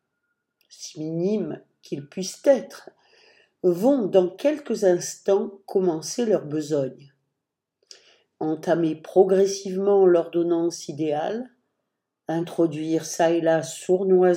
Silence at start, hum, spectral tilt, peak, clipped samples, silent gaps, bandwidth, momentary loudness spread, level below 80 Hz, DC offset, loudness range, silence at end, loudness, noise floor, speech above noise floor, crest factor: 0.8 s; none; -5.5 dB/octave; -4 dBFS; under 0.1%; none; 16.5 kHz; 14 LU; -78 dBFS; under 0.1%; 6 LU; 0 s; -23 LUFS; -83 dBFS; 61 dB; 20 dB